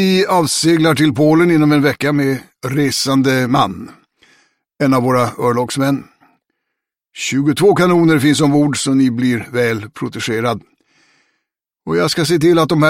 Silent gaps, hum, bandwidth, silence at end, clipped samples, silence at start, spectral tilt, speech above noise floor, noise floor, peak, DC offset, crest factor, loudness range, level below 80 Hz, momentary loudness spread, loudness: none; none; 16.5 kHz; 0 s; under 0.1%; 0 s; -5.5 dB/octave; 64 dB; -78 dBFS; -2 dBFS; under 0.1%; 14 dB; 5 LU; -52 dBFS; 9 LU; -14 LUFS